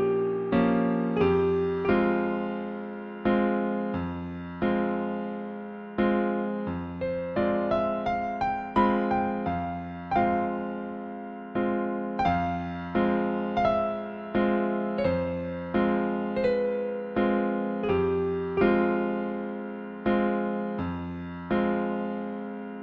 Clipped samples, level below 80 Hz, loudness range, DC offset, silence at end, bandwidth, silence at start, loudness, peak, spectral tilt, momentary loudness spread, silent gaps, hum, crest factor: under 0.1%; -52 dBFS; 3 LU; under 0.1%; 0 s; 6 kHz; 0 s; -28 LUFS; -10 dBFS; -9 dB/octave; 10 LU; none; none; 18 dB